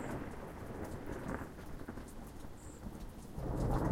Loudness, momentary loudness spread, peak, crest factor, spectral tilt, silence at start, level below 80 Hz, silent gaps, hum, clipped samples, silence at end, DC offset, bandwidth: -45 LUFS; 12 LU; -22 dBFS; 18 dB; -7 dB/octave; 0 s; -46 dBFS; none; none; under 0.1%; 0 s; under 0.1%; 16 kHz